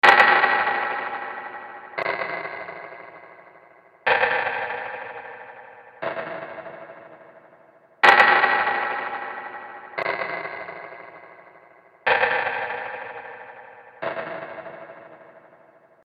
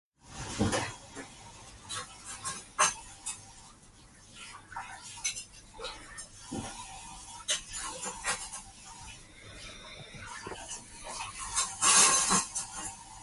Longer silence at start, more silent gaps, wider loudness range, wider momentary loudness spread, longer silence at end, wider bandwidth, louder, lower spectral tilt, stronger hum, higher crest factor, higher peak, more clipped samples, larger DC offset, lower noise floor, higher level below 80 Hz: second, 0.05 s vs 0.25 s; neither; about the same, 12 LU vs 13 LU; first, 25 LU vs 21 LU; first, 0.65 s vs 0 s; about the same, 12.5 kHz vs 12 kHz; first, -22 LUFS vs -31 LUFS; first, -3 dB/octave vs -1 dB/octave; neither; about the same, 24 dB vs 26 dB; first, -2 dBFS vs -10 dBFS; neither; neither; about the same, -54 dBFS vs -56 dBFS; second, -68 dBFS vs -56 dBFS